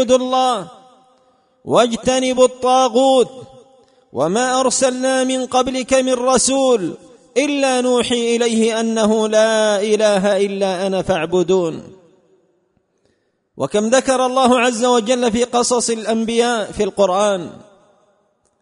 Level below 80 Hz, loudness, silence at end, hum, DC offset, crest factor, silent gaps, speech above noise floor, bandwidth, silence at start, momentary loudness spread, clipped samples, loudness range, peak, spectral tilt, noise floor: -52 dBFS; -16 LUFS; 1 s; none; under 0.1%; 16 dB; none; 48 dB; 11 kHz; 0 s; 6 LU; under 0.1%; 4 LU; 0 dBFS; -3.5 dB/octave; -64 dBFS